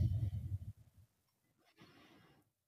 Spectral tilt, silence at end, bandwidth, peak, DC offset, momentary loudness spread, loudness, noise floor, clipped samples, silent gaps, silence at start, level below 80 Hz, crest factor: -8.5 dB/octave; 0.85 s; 6 kHz; -24 dBFS; under 0.1%; 25 LU; -43 LUFS; -81 dBFS; under 0.1%; none; 0 s; -54 dBFS; 20 dB